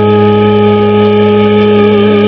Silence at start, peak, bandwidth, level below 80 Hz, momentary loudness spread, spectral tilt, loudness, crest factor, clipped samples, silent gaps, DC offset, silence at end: 0 s; 0 dBFS; 5.4 kHz; -42 dBFS; 1 LU; -9.5 dB/octave; -7 LUFS; 6 dB; 3%; none; under 0.1%; 0 s